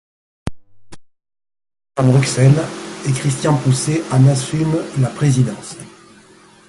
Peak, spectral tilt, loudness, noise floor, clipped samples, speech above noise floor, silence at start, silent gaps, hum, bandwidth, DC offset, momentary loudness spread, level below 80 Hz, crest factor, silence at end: 0 dBFS; -6 dB/octave; -16 LUFS; -46 dBFS; under 0.1%; 31 dB; 0.45 s; none; none; 11.5 kHz; under 0.1%; 18 LU; -46 dBFS; 16 dB; 0.8 s